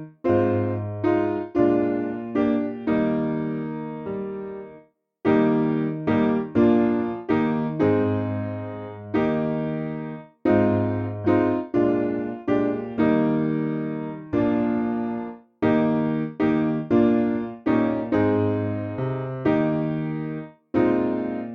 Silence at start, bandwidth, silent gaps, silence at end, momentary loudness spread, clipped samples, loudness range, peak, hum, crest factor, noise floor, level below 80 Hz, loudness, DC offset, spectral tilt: 0 s; 5.2 kHz; none; 0 s; 10 LU; under 0.1%; 3 LU; -6 dBFS; none; 16 dB; -52 dBFS; -54 dBFS; -23 LUFS; under 0.1%; -10 dB/octave